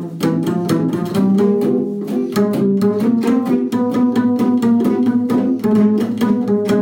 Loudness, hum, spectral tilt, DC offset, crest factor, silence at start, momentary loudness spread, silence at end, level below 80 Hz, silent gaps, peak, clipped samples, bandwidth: -16 LUFS; none; -8 dB/octave; under 0.1%; 12 dB; 0 s; 4 LU; 0 s; -58 dBFS; none; -4 dBFS; under 0.1%; 17 kHz